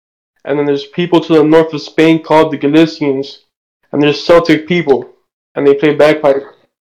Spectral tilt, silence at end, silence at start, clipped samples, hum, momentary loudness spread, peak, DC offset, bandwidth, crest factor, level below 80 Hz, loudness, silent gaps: -6.5 dB/octave; 0.4 s; 0.45 s; 0.3%; none; 9 LU; 0 dBFS; under 0.1%; 10 kHz; 12 dB; -48 dBFS; -11 LUFS; 3.57-3.80 s, 5.33-5.55 s